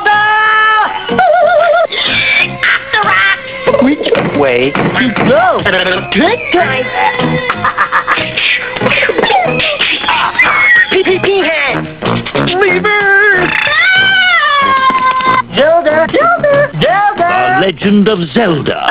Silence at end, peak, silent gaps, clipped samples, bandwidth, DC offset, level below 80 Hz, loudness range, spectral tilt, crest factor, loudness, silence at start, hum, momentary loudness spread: 0 s; 0 dBFS; none; 0.1%; 4 kHz; 0.5%; -40 dBFS; 3 LU; -8 dB/octave; 10 dB; -9 LUFS; 0 s; none; 6 LU